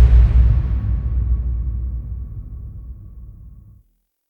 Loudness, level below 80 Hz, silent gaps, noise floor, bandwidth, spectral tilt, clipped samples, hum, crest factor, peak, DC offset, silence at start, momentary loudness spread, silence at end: -20 LUFS; -18 dBFS; none; -59 dBFS; 3 kHz; -10 dB/octave; under 0.1%; none; 16 dB; -2 dBFS; under 0.1%; 0 s; 24 LU; 0.75 s